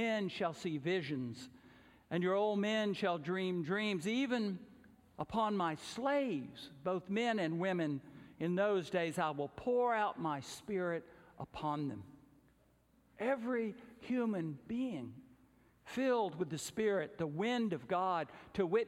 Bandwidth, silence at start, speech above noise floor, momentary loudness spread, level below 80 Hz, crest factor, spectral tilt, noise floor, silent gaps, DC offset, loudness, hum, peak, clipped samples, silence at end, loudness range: 15 kHz; 0 s; 34 dB; 10 LU; -72 dBFS; 16 dB; -6 dB/octave; -70 dBFS; none; under 0.1%; -37 LUFS; none; -22 dBFS; under 0.1%; 0 s; 4 LU